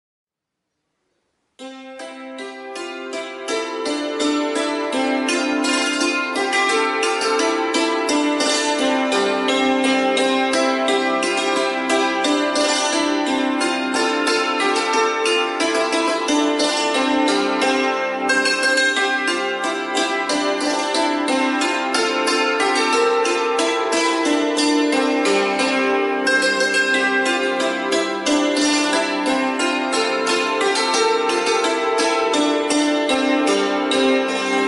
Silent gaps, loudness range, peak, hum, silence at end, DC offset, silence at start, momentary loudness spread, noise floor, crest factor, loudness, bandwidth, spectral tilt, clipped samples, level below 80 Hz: none; 3 LU; -4 dBFS; none; 0 s; under 0.1%; 1.6 s; 4 LU; -81 dBFS; 14 dB; -18 LUFS; 11.5 kHz; -1.5 dB/octave; under 0.1%; -64 dBFS